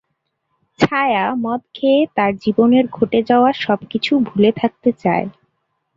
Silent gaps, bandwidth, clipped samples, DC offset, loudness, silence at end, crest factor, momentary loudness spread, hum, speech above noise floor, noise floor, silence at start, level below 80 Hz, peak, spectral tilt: none; 7.6 kHz; under 0.1%; under 0.1%; -17 LUFS; 0.65 s; 16 dB; 6 LU; none; 56 dB; -72 dBFS; 0.8 s; -56 dBFS; 0 dBFS; -7 dB/octave